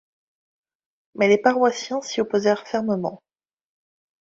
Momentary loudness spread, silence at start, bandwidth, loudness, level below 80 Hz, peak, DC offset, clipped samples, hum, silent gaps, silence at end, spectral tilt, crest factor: 9 LU; 1.15 s; 7.8 kHz; -22 LUFS; -68 dBFS; -4 dBFS; under 0.1%; under 0.1%; none; none; 1.05 s; -4.5 dB/octave; 20 dB